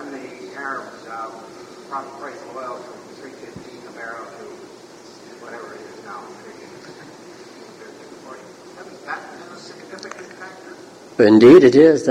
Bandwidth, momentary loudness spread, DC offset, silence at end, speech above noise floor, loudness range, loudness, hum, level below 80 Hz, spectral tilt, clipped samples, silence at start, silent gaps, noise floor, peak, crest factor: 10 kHz; 28 LU; under 0.1%; 0 s; 25 dB; 21 LU; -12 LUFS; none; -62 dBFS; -6.5 dB/octave; under 0.1%; 0.05 s; none; -42 dBFS; 0 dBFS; 20 dB